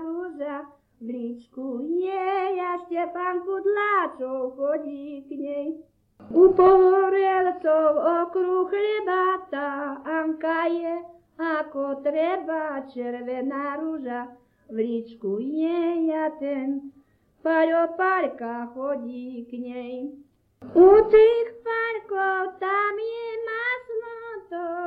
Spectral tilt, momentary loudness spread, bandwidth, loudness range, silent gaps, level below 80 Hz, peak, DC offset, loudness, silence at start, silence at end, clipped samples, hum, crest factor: -7.5 dB/octave; 17 LU; 4.8 kHz; 8 LU; none; -58 dBFS; -4 dBFS; under 0.1%; -24 LUFS; 0 s; 0 s; under 0.1%; none; 20 dB